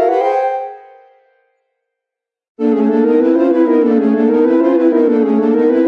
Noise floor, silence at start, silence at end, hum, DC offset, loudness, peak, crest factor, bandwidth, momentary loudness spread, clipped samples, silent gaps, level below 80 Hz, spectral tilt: -83 dBFS; 0 s; 0 s; none; under 0.1%; -13 LUFS; -2 dBFS; 12 dB; 6 kHz; 6 LU; under 0.1%; 2.49-2.55 s; -68 dBFS; -8.5 dB/octave